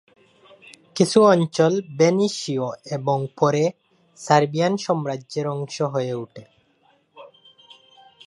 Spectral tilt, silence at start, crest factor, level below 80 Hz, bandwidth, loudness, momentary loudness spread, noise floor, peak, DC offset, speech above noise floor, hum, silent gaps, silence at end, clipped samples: -5.5 dB/octave; 0.95 s; 22 dB; -70 dBFS; 11.5 kHz; -21 LUFS; 12 LU; -62 dBFS; -2 dBFS; under 0.1%; 41 dB; none; none; 1 s; under 0.1%